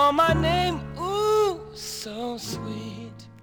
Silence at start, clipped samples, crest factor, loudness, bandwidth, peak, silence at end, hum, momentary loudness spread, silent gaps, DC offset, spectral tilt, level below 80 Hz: 0 s; under 0.1%; 18 dB; -25 LUFS; over 20 kHz; -8 dBFS; 0 s; none; 15 LU; none; under 0.1%; -5 dB/octave; -44 dBFS